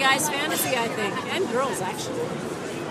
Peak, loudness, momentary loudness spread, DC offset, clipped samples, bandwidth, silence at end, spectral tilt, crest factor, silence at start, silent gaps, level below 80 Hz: -8 dBFS; -25 LUFS; 8 LU; under 0.1%; under 0.1%; 15.5 kHz; 0 s; -3 dB/octave; 18 dB; 0 s; none; -62 dBFS